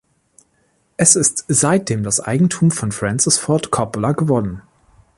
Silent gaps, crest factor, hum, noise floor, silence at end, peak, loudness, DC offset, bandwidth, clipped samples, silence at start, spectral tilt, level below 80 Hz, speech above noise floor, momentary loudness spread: none; 18 dB; none; -62 dBFS; 0.6 s; 0 dBFS; -16 LUFS; under 0.1%; 11.5 kHz; under 0.1%; 1 s; -4 dB/octave; -48 dBFS; 45 dB; 8 LU